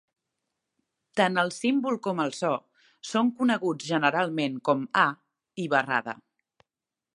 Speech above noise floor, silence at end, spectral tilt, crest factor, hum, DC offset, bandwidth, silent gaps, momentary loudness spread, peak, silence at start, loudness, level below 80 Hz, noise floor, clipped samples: 64 dB; 1 s; -5 dB/octave; 22 dB; none; under 0.1%; 11.5 kHz; none; 11 LU; -6 dBFS; 1.15 s; -26 LUFS; -78 dBFS; -90 dBFS; under 0.1%